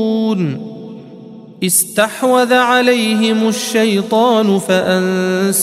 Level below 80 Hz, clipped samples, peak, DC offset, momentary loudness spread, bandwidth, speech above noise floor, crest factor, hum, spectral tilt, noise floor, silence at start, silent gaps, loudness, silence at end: -62 dBFS; under 0.1%; 0 dBFS; under 0.1%; 11 LU; 16 kHz; 21 dB; 14 dB; none; -4 dB/octave; -35 dBFS; 0 s; none; -13 LUFS; 0 s